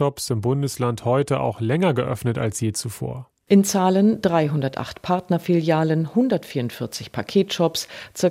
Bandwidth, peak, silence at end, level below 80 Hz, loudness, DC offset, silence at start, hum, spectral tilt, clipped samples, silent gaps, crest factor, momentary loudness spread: 16 kHz; -4 dBFS; 0 s; -56 dBFS; -22 LUFS; under 0.1%; 0 s; none; -6 dB/octave; under 0.1%; none; 16 dB; 11 LU